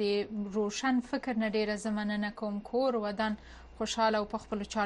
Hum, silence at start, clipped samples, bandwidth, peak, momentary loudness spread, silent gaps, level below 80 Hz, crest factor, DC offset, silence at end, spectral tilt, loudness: none; 0 s; under 0.1%; 11 kHz; -16 dBFS; 7 LU; none; -58 dBFS; 16 dB; under 0.1%; 0 s; -4.5 dB/octave; -32 LUFS